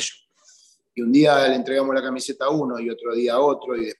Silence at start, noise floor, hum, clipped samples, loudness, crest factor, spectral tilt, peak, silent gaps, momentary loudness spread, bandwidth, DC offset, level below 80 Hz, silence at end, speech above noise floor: 0 s; -55 dBFS; none; under 0.1%; -21 LUFS; 16 dB; -4.5 dB/octave; -6 dBFS; none; 12 LU; 12.5 kHz; under 0.1%; -68 dBFS; 0.05 s; 35 dB